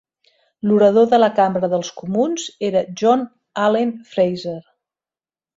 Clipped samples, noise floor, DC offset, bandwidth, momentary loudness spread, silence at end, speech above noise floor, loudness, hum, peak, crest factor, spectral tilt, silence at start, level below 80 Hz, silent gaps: under 0.1%; under -90 dBFS; under 0.1%; 7.8 kHz; 12 LU; 0.95 s; over 73 dB; -18 LUFS; none; -2 dBFS; 16 dB; -5.5 dB/octave; 0.65 s; -62 dBFS; none